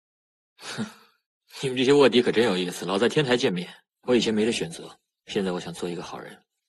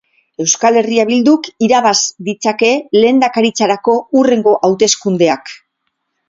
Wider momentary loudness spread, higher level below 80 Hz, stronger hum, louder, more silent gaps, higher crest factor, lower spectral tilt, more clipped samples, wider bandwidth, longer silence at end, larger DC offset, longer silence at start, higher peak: first, 21 LU vs 6 LU; second, -64 dBFS vs -58 dBFS; neither; second, -24 LUFS vs -12 LUFS; first, 1.26-1.41 s vs none; first, 20 dB vs 12 dB; about the same, -4.5 dB/octave vs -3.5 dB/octave; neither; first, 12.5 kHz vs 7.8 kHz; second, 0.35 s vs 0.75 s; neither; first, 0.6 s vs 0.4 s; second, -6 dBFS vs 0 dBFS